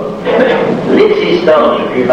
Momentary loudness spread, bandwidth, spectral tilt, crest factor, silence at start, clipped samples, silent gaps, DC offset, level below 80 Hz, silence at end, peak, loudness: 4 LU; 8.8 kHz; -6.5 dB/octave; 10 dB; 0 s; under 0.1%; none; under 0.1%; -44 dBFS; 0 s; 0 dBFS; -10 LUFS